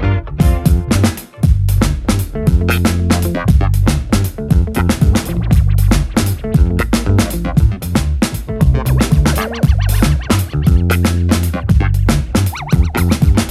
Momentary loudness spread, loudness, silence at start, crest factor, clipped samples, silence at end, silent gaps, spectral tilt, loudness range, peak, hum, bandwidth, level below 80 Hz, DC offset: 4 LU; -14 LUFS; 0 s; 12 dB; under 0.1%; 0 s; none; -6 dB/octave; 1 LU; 0 dBFS; none; 15.5 kHz; -18 dBFS; under 0.1%